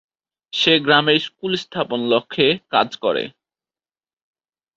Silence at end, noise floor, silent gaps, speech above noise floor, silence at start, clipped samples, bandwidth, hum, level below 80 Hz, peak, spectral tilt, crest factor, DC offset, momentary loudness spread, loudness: 1.5 s; under -90 dBFS; none; over 71 dB; 0.55 s; under 0.1%; 7.8 kHz; none; -62 dBFS; -2 dBFS; -4.5 dB/octave; 20 dB; under 0.1%; 10 LU; -18 LUFS